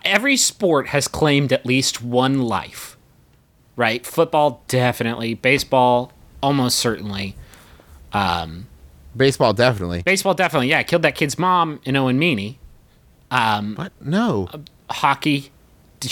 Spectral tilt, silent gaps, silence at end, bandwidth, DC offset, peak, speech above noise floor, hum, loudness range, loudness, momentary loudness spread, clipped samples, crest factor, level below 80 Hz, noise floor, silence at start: -4 dB/octave; none; 0 s; 19 kHz; under 0.1%; -2 dBFS; 36 dB; none; 4 LU; -19 LUFS; 14 LU; under 0.1%; 18 dB; -48 dBFS; -55 dBFS; 0.05 s